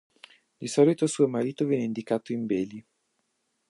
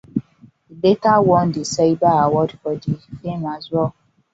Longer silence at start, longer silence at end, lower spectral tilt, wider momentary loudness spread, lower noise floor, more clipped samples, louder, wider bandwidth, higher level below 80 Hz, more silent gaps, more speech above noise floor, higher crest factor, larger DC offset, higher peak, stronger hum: first, 0.6 s vs 0.15 s; first, 0.9 s vs 0.45 s; about the same, -6 dB/octave vs -6.5 dB/octave; about the same, 11 LU vs 12 LU; first, -76 dBFS vs -50 dBFS; neither; second, -26 LUFS vs -19 LUFS; first, 11.5 kHz vs 8 kHz; second, -72 dBFS vs -52 dBFS; neither; first, 50 dB vs 33 dB; about the same, 20 dB vs 16 dB; neither; second, -8 dBFS vs -2 dBFS; neither